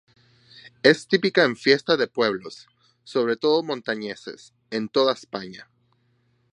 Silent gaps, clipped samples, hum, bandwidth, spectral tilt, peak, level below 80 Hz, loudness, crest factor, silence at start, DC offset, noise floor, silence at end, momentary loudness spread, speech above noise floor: none; under 0.1%; none; 10.5 kHz; -4.5 dB/octave; 0 dBFS; -72 dBFS; -22 LUFS; 24 dB; 0.65 s; under 0.1%; -66 dBFS; 0.9 s; 15 LU; 43 dB